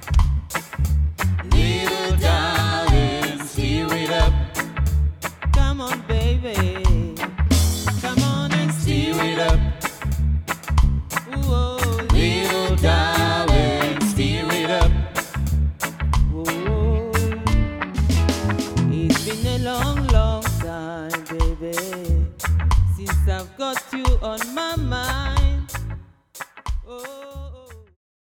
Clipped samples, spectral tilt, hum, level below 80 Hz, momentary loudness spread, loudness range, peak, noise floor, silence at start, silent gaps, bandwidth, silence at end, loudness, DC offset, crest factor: under 0.1%; -5 dB/octave; none; -24 dBFS; 8 LU; 4 LU; -2 dBFS; -40 dBFS; 0 s; none; 17.5 kHz; 0.5 s; -21 LUFS; under 0.1%; 18 dB